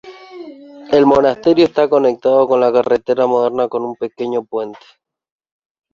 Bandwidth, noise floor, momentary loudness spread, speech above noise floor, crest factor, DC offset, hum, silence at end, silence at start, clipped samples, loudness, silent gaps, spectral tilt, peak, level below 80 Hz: 7.2 kHz; -35 dBFS; 15 LU; 21 dB; 14 dB; under 0.1%; none; 1.2 s; 0.05 s; under 0.1%; -15 LUFS; none; -6.5 dB/octave; 0 dBFS; -54 dBFS